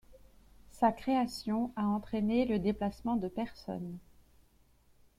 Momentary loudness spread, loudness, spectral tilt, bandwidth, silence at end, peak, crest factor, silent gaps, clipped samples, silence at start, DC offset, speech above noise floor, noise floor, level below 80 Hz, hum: 11 LU; -33 LUFS; -7 dB/octave; 15 kHz; 1.2 s; -16 dBFS; 18 dB; none; under 0.1%; 0.1 s; under 0.1%; 33 dB; -65 dBFS; -58 dBFS; none